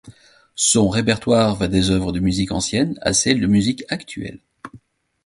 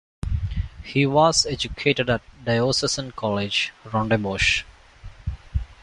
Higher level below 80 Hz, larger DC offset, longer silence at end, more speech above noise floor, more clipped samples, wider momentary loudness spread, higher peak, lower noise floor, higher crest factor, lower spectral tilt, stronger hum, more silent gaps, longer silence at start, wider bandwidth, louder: about the same, -40 dBFS vs -36 dBFS; neither; first, 0.5 s vs 0.1 s; first, 32 dB vs 21 dB; neither; second, 11 LU vs 14 LU; first, 0 dBFS vs -4 dBFS; first, -51 dBFS vs -43 dBFS; about the same, 20 dB vs 20 dB; about the same, -4 dB/octave vs -4 dB/octave; neither; neither; second, 0.05 s vs 0.25 s; about the same, 11.5 kHz vs 11.5 kHz; first, -18 LUFS vs -22 LUFS